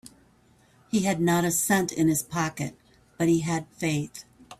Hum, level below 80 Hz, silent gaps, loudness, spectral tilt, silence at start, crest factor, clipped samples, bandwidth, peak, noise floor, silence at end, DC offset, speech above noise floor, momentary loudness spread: none; -60 dBFS; none; -26 LUFS; -4.5 dB/octave; 0.05 s; 16 dB; under 0.1%; 16 kHz; -12 dBFS; -60 dBFS; 0.05 s; under 0.1%; 35 dB; 11 LU